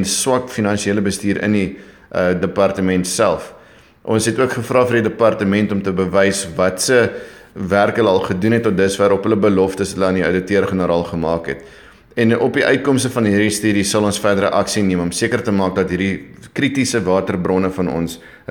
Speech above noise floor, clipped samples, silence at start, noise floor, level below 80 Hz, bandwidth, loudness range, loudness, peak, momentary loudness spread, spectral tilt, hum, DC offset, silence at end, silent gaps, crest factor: 28 dB; under 0.1%; 0 s; -44 dBFS; -46 dBFS; 19.5 kHz; 2 LU; -17 LUFS; 0 dBFS; 6 LU; -5 dB/octave; none; under 0.1%; 0.2 s; none; 16 dB